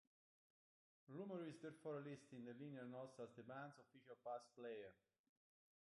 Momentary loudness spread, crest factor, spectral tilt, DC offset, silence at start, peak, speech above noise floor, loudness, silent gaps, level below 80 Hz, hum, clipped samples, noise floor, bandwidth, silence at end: 8 LU; 16 dB; -7 dB/octave; under 0.1%; 1.1 s; -40 dBFS; over 34 dB; -56 LUFS; none; under -90 dBFS; none; under 0.1%; under -90 dBFS; 11 kHz; 0.9 s